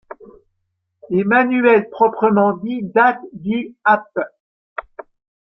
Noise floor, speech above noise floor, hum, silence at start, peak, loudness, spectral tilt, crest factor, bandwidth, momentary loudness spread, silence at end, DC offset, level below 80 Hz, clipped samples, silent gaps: -73 dBFS; 57 dB; none; 1.1 s; -2 dBFS; -17 LUFS; -10 dB/octave; 16 dB; 5.6 kHz; 17 LU; 0.6 s; under 0.1%; -60 dBFS; under 0.1%; 4.40-4.76 s